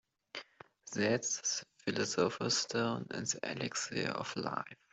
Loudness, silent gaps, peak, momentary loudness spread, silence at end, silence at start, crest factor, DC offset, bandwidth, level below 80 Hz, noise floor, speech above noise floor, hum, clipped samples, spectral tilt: -35 LUFS; none; -16 dBFS; 14 LU; 0.2 s; 0.35 s; 20 dB; under 0.1%; 8.2 kHz; -76 dBFS; -57 dBFS; 21 dB; none; under 0.1%; -3 dB/octave